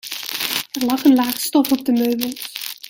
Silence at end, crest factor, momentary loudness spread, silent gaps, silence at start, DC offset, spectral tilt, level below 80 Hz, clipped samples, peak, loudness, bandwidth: 0.15 s; 20 dB; 10 LU; none; 0.05 s; under 0.1%; -2.5 dB/octave; -62 dBFS; under 0.1%; 0 dBFS; -19 LUFS; 17 kHz